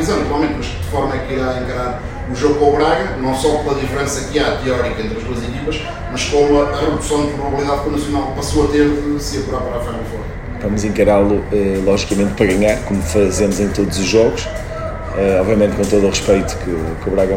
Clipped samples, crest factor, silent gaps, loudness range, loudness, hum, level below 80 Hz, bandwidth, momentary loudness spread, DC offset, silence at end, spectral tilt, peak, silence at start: under 0.1%; 16 dB; none; 3 LU; -17 LUFS; none; -28 dBFS; 16.5 kHz; 10 LU; under 0.1%; 0 s; -5.5 dB/octave; 0 dBFS; 0 s